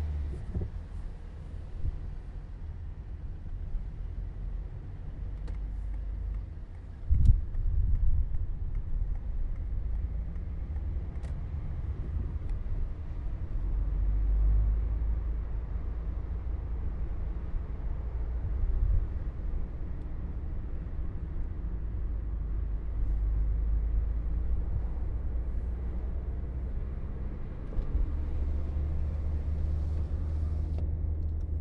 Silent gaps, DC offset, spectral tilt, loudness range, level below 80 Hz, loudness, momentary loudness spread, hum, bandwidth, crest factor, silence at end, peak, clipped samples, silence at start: none; under 0.1%; -10 dB/octave; 8 LU; -32 dBFS; -36 LUFS; 10 LU; none; 3 kHz; 22 dB; 0 s; -8 dBFS; under 0.1%; 0 s